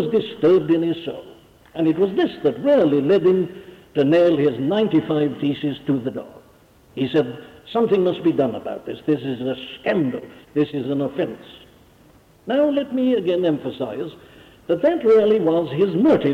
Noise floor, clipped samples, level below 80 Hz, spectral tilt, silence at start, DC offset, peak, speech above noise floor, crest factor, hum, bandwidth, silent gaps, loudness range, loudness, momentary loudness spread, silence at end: -52 dBFS; under 0.1%; -60 dBFS; -8.5 dB/octave; 0 s; under 0.1%; -8 dBFS; 32 dB; 12 dB; none; 7.4 kHz; none; 6 LU; -20 LUFS; 14 LU; 0 s